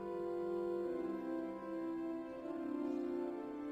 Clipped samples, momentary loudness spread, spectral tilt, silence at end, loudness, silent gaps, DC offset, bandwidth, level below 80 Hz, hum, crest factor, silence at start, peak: under 0.1%; 4 LU; -8 dB/octave; 0 s; -42 LUFS; none; under 0.1%; 8.6 kHz; -74 dBFS; none; 12 dB; 0 s; -30 dBFS